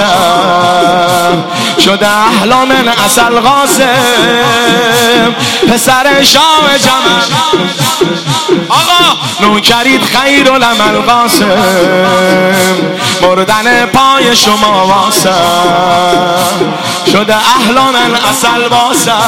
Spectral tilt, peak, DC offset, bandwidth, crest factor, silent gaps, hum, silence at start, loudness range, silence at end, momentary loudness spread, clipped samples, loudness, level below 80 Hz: -3 dB/octave; 0 dBFS; 0.9%; 17.5 kHz; 8 dB; none; none; 0 s; 2 LU; 0 s; 4 LU; 0.6%; -6 LUFS; -40 dBFS